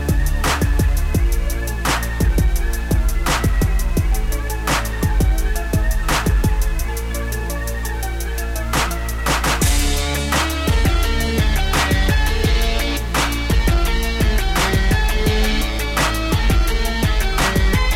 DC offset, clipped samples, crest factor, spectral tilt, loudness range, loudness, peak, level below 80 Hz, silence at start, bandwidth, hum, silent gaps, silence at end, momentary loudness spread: 0.5%; under 0.1%; 10 dB; -4.5 dB/octave; 3 LU; -19 LUFS; -6 dBFS; -18 dBFS; 0 s; 16.5 kHz; none; none; 0 s; 6 LU